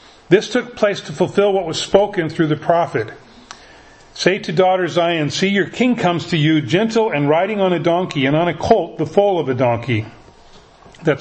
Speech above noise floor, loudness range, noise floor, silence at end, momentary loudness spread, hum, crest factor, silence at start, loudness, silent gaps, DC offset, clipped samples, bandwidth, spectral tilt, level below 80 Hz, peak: 28 dB; 2 LU; -45 dBFS; 0 s; 5 LU; none; 18 dB; 0.3 s; -17 LUFS; none; under 0.1%; under 0.1%; 8.6 kHz; -5.5 dB/octave; -50 dBFS; 0 dBFS